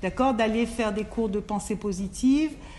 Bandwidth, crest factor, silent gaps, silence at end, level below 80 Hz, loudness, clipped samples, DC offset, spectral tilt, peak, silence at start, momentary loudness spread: 12 kHz; 14 dB; none; 0 s; -44 dBFS; -26 LUFS; under 0.1%; under 0.1%; -5.5 dB/octave; -12 dBFS; 0 s; 7 LU